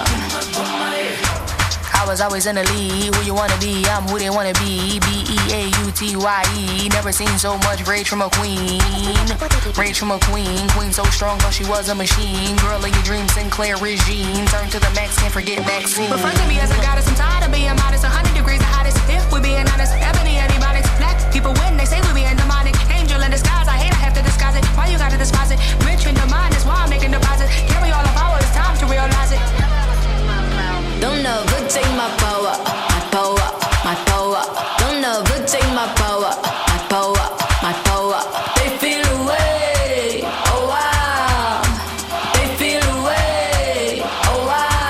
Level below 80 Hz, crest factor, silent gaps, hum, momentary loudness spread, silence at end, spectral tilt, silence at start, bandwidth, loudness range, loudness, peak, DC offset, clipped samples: -18 dBFS; 14 dB; none; none; 3 LU; 0 s; -4 dB/octave; 0 s; 15.5 kHz; 1 LU; -17 LUFS; -2 dBFS; under 0.1%; under 0.1%